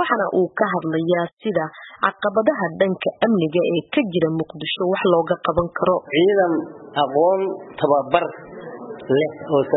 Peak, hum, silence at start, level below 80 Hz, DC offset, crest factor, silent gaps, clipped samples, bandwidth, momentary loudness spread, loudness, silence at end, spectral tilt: -2 dBFS; none; 0 s; -54 dBFS; under 0.1%; 18 dB; 1.33-1.37 s; under 0.1%; 4.1 kHz; 8 LU; -20 LUFS; 0 s; -11 dB/octave